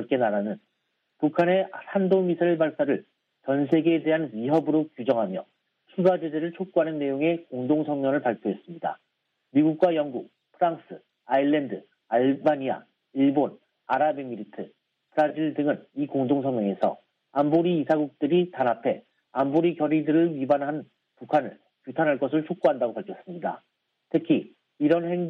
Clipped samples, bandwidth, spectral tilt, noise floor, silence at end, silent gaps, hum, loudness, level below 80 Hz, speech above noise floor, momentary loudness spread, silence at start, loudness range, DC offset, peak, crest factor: under 0.1%; 5.2 kHz; -9 dB/octave; -76 dBFS; 0 s; none; none; -25 LUFS; -76 dBFS; 51 dB; 13 LU; 0 s; 3 LU; under 0.1%; -8 dBFS; 18 dB